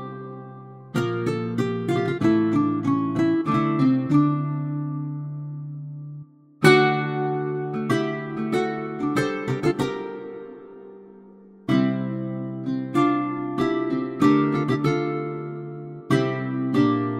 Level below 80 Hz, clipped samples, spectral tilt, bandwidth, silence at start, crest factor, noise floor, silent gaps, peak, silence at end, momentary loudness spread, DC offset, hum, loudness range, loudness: -58 dBFS; under 0.1%; -7 dB/octave; 15 kHz; 0 s; 20 dB; -47 dBFS; none; -2 dBFS; 0 s; 16 LU; under 0.1%; none; 5 LU; -23 LUFS